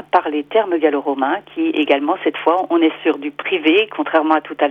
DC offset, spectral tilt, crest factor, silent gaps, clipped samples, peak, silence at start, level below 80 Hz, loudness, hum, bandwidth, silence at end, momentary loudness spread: under 0.1%; -6 dB/octave; 16 dB; none; under 0.1%; 0 dBFS; 0 s; -70 dBFS; -17 LUFS; 50 Hz at -55 dBFS; 4.6 kHz; 0 s; 5 LU